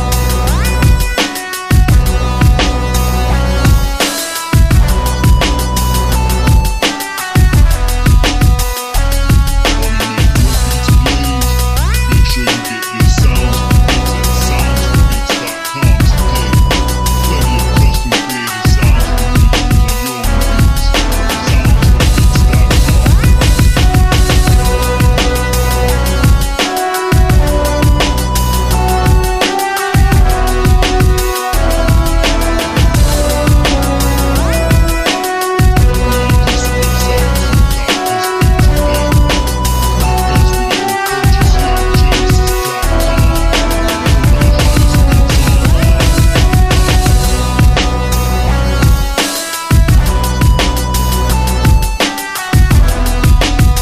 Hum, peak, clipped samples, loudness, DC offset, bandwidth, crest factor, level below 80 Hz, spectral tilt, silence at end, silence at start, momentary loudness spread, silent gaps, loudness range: none; 0 dBFS; under 0.1%; -12 LUFS; under 0.1%; 15.5 kHz; 10 dB; -12 dBFS; -5 dB/octave; 0 s; 0 s; 4 LU; none; 2 LU